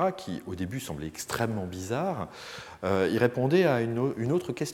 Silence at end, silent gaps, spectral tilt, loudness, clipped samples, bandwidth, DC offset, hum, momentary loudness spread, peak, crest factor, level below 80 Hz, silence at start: 0 s; none; -6 dB/octave; -29 LUFS; under 0.1%; 17 kHz; under 0.1%; none; 13 LU; -8 dBFS; 20 dB; -60 dBFS; 0 s